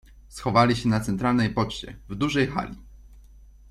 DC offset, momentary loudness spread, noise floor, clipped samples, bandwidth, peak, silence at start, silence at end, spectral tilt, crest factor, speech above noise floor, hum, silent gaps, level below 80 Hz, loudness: under 0.1%; 17 LU; -49 dBFS; under 0.1%; 13.5 kHz; -6 dBFS; 0.15 s; 0.5 s; -6 dB/octave; 20 dB; 25 dB; none; none; -46 dBFS; -24 LUFS